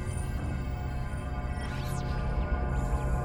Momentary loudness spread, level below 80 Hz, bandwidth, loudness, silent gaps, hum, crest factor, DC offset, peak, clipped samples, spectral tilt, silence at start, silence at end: 4 LU; -34 dBFS; over 20 kHz; -34 LUFS; none; none; 14 dB; under 0.1%; -18 dBFS; under 0.1%; -6.5 dB/octave; 0 s; 0 s